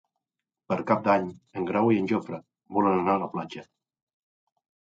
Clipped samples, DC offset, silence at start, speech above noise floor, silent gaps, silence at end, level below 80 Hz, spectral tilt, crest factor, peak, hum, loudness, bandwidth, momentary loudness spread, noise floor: under 0.1%; under 0.1%; 0.7 s; 63 dB; none; 1.35 s; -66 dBFS; -8 dB/octave; 22 dB; -6 dBFS; none; -26 LUFS; 7.8 kHz; 16 LU; -89 dBFS